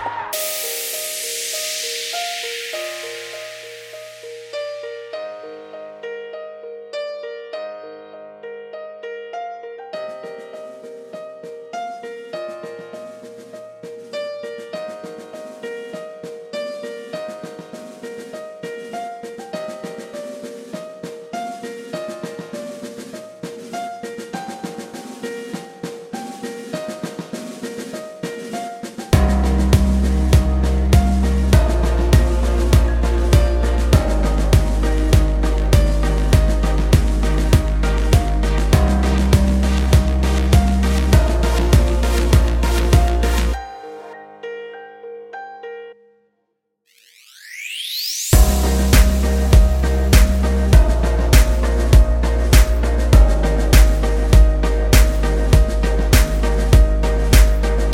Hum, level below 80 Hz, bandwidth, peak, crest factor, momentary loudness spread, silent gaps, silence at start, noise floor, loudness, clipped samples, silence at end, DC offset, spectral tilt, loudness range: none; -18 dBFS; 17 kHz; 0 dBFS; 16 dB; 19 LU; none; 0 s; -71 dBFS; -18 LUFS; under 0.1%; 0 s; under 0.1%; -5.5 dB/octave; 16 LU